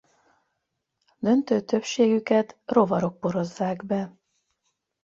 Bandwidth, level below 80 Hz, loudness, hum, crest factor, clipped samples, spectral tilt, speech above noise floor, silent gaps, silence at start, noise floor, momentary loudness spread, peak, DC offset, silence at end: 7.6 kHz; -66 dBFS; -24 LUFS; none; 20 dB; under 0.1%; -6.5 dB/octave; 56 dB; none; 1.2 s; -79 dBFS; 8 LU; -6 dBFS; under 0.1%; 0.95 s